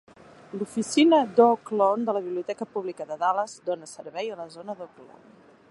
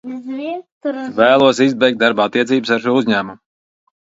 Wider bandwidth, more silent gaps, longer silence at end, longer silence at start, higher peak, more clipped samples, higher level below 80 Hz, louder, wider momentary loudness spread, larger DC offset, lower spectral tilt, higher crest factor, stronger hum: first, 11.5 kHz vs 7.8 kHz; second, none vs 0.72-0.81 s; about the same, 0.65 s vs 0.7 s; first, 0.55 s vs 0.05 s; second, -6 dBFS vs 0 dBFS; neither; second, -76 dBFS vs -60 dBFS; second, -25 LUFS vs -15 LUFS; first, 19 LU vs 14 LU; neither; about the same, -4.5 dB/octave vs -5 dB/octave; about the same, 20 dB vs 16 dB; neither